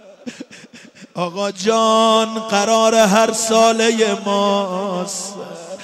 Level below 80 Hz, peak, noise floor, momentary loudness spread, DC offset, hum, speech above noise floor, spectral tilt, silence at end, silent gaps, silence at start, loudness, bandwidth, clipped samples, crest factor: -66 dBFS; -2 dBFS; -42 dBFS; 20 LU; under 0.1%; none; 26 dB; -3.5 dB/octave; 0 s; none; 0.1 s; -16 LUFS; 15.5 kHz; under 0.1%; 14 dB